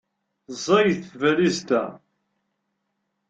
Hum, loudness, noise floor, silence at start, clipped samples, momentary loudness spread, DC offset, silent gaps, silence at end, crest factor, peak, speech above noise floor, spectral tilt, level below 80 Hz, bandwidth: none; -22 LUFS; -76 dBFS; 0.5 s; under 0.1%; 14 LU; under 0.1%; none; 1.35 s; 20 dB; -4 dBFS; 55 dB; -5 dB/octave; -66 dBFS; 9 kHz